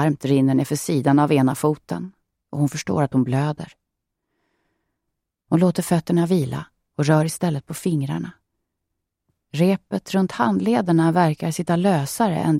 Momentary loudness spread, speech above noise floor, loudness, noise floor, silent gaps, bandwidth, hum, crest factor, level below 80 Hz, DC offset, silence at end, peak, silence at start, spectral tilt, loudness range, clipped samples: 12 LU; 60 dB; -21 LUFS; -79 dBFS; none; 16 kHz; none; 18 dB; -58 dBFS; under 0.1%; 0 s; -4 dBFS; 0 s; -6.5 dB/octave; 5 LU; under 0.1%